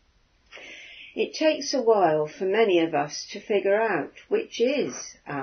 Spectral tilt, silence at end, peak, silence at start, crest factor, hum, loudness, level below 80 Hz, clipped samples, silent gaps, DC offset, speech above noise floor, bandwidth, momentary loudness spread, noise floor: -4 dB/octave; 0 s; -8 dBFS; 0.55 s; 18 dB; none; -25 LUFS; -68 dBFS; under 0.1%; none; under 0.1%; 39 dB; 6.6 kHz; 18 LU; -63 dBFS